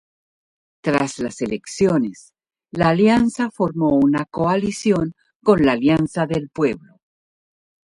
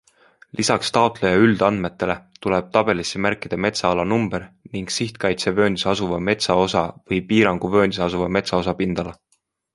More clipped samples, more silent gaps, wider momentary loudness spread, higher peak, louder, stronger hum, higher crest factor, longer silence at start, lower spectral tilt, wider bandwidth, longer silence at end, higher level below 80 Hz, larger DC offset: neither; first, 5.36-5.40 s vs none; about the same, 10 LU vs 8 LU; about the same, -2 dBFS vs -2 dBFS; about the same, -19 LUFS vs -20 LUFS; neither; about the same, 18 dB vs 20 dB; first, 0.85 s vs 0.55 s; first, -6.5 dB/octave vs -5 dB/octave; about the same, 11.5 kHz vs 11.5 kHz; first, 1.05 s vs 0.6 s; about the same, -50 dBFS vs -46 dBFS; neither